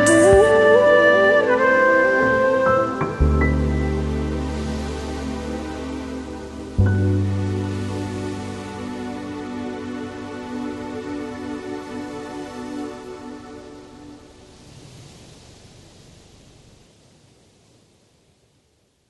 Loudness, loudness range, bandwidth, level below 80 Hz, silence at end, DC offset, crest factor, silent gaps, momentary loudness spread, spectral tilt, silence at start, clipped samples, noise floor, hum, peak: -20 LUFS; 20 LU; 12 kHz; -34 dBFS; 3.75 s; under 0.1%; 18 dB; none; 19 LU; -6 dB/octave; 0 s; under 0.1%; -63 dBFS; none; -2 dBFS